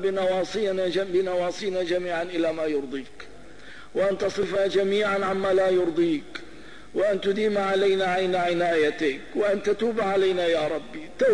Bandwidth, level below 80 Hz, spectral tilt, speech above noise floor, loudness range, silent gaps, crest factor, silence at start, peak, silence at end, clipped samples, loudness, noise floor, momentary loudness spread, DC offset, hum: 10.5 kHz; -58 dBFS; -5 dB/octave; 22 dB; 4 LU; none; 12 dB; 0 s; -12 dBFS; 0 s; under 0.1%; -25 LUFS; -46 dBFS; 12 LU; 0.8%; none